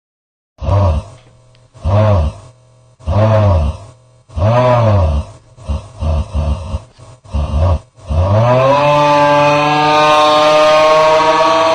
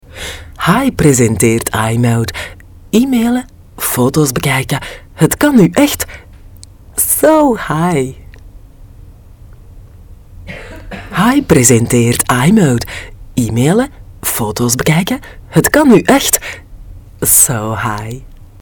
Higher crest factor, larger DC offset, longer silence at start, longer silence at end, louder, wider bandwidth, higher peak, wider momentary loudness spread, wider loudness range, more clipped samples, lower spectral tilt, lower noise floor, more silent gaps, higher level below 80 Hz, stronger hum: about the same, 12 dB vs 14 dB; neither; first, 0.6 s vs 0.1 s; second, 0 s vs 0.2 s; about the same, -12 LUFS vs -12 LUFS; second, 10 kHz vs 18 kHz; about the same, -2 dBFS vs 0 dBFS; about the same, 16 LU vs 17 LU; first, 8 LU vs 4 LU; neither; first, -6 dB/octave vs -4.5 dB/octave; first, -46 dBFS vs -36 dBFS; neither; first, -26 dBFS vs -34 dBFS; neither